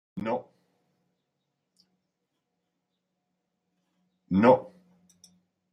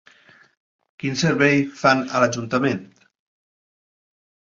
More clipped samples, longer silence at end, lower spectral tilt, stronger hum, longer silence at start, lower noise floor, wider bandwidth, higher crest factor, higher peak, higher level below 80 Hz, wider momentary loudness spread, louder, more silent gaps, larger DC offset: neither; second, 1.05 s vs 1.65 s; first, -8.5 dB/octave vs -5 dB/octave; neither; second, 0.15 s vs 1.05 s; first, -81 dBFS vs -52 dBFS; first, 10 kHz vs 7.6 kHz; about the same, 24 dB vs 22 dB; second, -8 dBFS vs -2 dBFS; second, -74 dBFS vs -62 dBFS; first, 12 LU vs 9 LU; second, -25 LUFS vs -20 LUFS; neither; neither